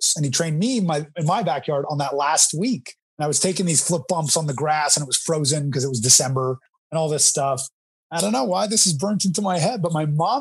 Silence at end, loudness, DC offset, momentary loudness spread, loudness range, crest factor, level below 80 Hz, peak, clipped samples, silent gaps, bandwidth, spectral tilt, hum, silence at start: 0 s; -20 LUFS; under 0.1%; 8 LU; 2 LU; 18 dB; -68 dBFS; -2 dBFS; under 0.1%; 3.02-3.17 s, 6.69-6.90 s, 7.72-8.10 s; 15.5 kHz; -3.5 dB/octave; none; 0 s